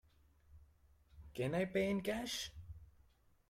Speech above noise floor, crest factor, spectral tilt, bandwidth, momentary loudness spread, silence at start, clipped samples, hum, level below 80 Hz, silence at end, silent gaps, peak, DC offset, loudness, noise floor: 32 dB; 18 dB; -5 dB/octave; 16.5 kHz; 20 LU; 0.5 s; under 0.1%; none; -64 dBFS; 0.65 s; none; -26 dBFS; under 0.1%; -40 LUFS; -70 dBFS